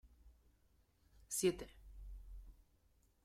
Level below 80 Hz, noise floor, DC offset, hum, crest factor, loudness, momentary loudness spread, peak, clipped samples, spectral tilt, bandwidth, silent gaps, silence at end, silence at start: -60 dBFS; -74 dBFS; under 0.1%; none; 24 dB; -40 LUFS; 22 LU; -24 dBFS; under 0.1%; -4 dB/octave; 16 kHz; none; 0.7 s; 0.05 s